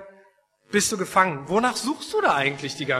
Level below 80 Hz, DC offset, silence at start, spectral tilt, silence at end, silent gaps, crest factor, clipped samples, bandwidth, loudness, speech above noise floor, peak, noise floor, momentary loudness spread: -60 dBFS; under 0.1%; 0 s; -3 dB/octave; 0 s; none; 20 dB; under 0.1%; 13.5 kHz; -23 LUFS; 37 dB; -4 dBFS; -60 dBFS; 5 LU